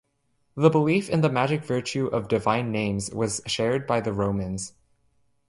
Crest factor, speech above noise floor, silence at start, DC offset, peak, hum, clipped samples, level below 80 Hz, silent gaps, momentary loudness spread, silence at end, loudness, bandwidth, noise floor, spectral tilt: 20 dB; 46 dB; 0.55 s; under 0.1%; -4 dBFS; none; under 0.1%; -52 dBFS; none; 7 LU; 0.8 s; -25 LUFS; 11.5 kHz; -70 dBFS; -5.5 dB/octave